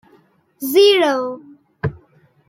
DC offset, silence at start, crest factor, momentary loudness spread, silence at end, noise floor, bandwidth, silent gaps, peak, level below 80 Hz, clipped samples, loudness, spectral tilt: under 0.1%; 0.6 s; 16 dB; 16 LU; 0.55 s; -55 dBFS; 16.5 kHz; none; -2 dBFS; -52 dBFS; under 0.1%; -16 LUFS; -4.5 dB/octave